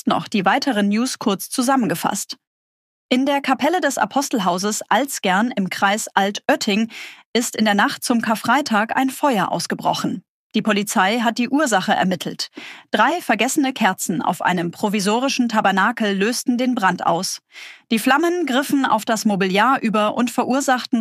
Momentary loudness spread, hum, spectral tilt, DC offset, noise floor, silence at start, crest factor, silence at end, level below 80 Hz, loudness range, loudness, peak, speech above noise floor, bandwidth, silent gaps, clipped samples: 6 LU; none; -4 dB/octave; under 0.1%; under -90 dBFS; 0.05 s; 16 dB; 0 s; -72 dBFS; 2 LU; -19 LUFS; -2 dBFS; over 71 dB; 15.5 kHz; 2.47-3.09 s, 7.25-7.33 s, 10.29-10.50 s; under 0.1%